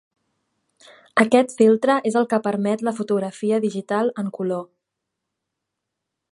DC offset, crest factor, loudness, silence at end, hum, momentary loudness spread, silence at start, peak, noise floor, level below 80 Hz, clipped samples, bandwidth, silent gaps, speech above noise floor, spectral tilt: under 0.1%; 20 dB; -21 LUFS; 1.7 s; none; 9 LU; 1.15 s; -2 dBFS; -81 dBFS; -72 dBFS; under 0.1%; 11.5 kHz; none; 62 dB; -6 dB/octave